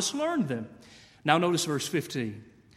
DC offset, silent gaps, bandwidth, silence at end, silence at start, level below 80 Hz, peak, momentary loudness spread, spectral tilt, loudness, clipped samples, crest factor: under 0.1%; none; 16 kHz; 0.25 s; 0 s; -68 dBFS; -6 dBFS; 13 LU; -4 dB/octave; -29 LUFS; under 0.1%; 24 dB